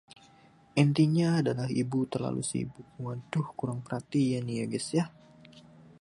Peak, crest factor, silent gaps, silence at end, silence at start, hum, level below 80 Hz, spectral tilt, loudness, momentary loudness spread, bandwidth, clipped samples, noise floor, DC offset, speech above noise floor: -8 dBFS; 22 dB; none; 0.4 s; 0.75 s; none; -66 dBFS; -6.5 dB/octave; -30 LUFS; 13 LU; 11.5 kHz; under 0.1%; -59 dBFS; under 0.1%; 30 dB